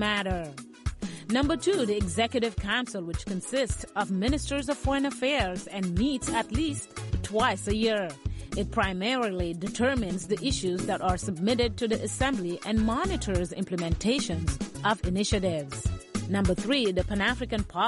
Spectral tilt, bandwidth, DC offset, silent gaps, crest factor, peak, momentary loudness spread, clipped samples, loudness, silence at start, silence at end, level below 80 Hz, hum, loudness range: -5 dB/octave; 11.5 kHz; under 0.1%; none; 16 dB; -12 dBFS; 7 LU; under 0.1%; -29 LUFS; 0 s; 0 s; -38 dBFS; none; 1 LU